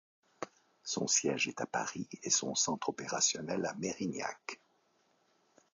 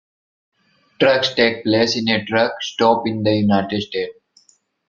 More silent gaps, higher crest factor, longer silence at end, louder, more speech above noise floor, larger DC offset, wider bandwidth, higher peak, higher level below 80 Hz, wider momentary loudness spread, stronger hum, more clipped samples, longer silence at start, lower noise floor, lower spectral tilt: neither; about the same, 22 dB vs 18 dB; first, 1.2 s vs 0.75 s; second, -34 LUFS vs -18 LUFS; about the same, 38 dB vs 41 dB; neither; first, 9.4 kHz vs 7.4 kHz; second, -16 dBFS vs 0 dBFS; second, -76 dBFS vs -58 dBFS; first, 18 LU vs 7 LU; neither; neither; second, 0.4 s vs 1 s; first, -73 dBFS vs -58 dBFS; second, -2 dB/octave vs -5 dB/octave